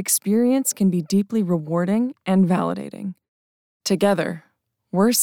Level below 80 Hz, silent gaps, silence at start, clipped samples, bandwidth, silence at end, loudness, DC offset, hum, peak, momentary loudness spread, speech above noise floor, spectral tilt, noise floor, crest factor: -68 dBFS; 3.28-3.80 s; 0 s; under 0.1%; 19 kHz; 0 s; -21 LUFS; under 0.1%; none; -6 dBFS; 12 LU; over 70 dB; -5 dB/octave; under -90 dBFS; 14 dB